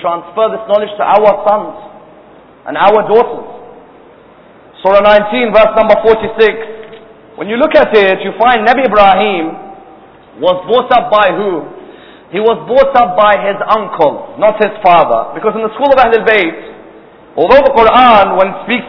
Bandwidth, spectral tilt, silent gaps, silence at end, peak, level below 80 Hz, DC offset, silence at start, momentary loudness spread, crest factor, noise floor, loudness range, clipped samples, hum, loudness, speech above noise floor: 5.4 kHz; -7 dB/octave; none; 0 s; 0 dBFS; -40 dBFS; under 0.1%; 0 s; 14 LU; 10 dB; -39 dBFS; 3 LU; 2%; none; -9 LUFS; 30 dB